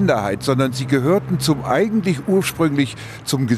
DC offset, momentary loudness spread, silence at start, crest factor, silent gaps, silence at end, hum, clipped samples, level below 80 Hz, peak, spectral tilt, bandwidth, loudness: under 0.1%; 4 LU; 0 s; 14 dB; none; 0 s; none; under 0.1%; -48 dBFS; -4 dBFS; -6 dB/octave; 14 kHz; -19 LUFS